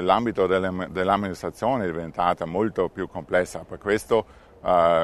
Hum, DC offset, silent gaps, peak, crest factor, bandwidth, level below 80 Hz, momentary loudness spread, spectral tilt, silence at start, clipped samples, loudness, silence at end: none; under 0.1%; none; -4 dBFS; 20 dB; 13.5 kHz; -52 dBFS; 10 LU; -6 dB/octave; 0 s; under 0.1%; -25 LUFS; 0 s